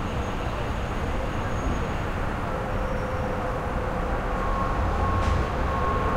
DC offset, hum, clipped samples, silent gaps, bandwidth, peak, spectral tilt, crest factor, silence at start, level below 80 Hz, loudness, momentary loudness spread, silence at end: under 0.1%; none; under 0.1%; none; 15.5 kHz; -12 dBFS; -6.5 dB/octave; 14 dB; 0 s; -30 dBFS; -28 LUFS; 4 LU; 0 s